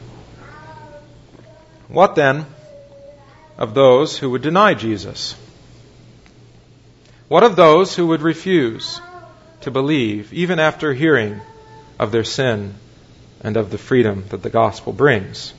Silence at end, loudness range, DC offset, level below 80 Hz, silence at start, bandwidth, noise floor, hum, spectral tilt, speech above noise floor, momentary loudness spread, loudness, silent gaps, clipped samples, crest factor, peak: 0.05 s; 5 LU; under 0.1%; -52 dBFS; 0 s; 8 kHz; -47 dBFS; none; -6 dB/octave; 32 dB; 15 LU; -16 LUFS; none; under 0.1%; 18 dB; 0 dBFS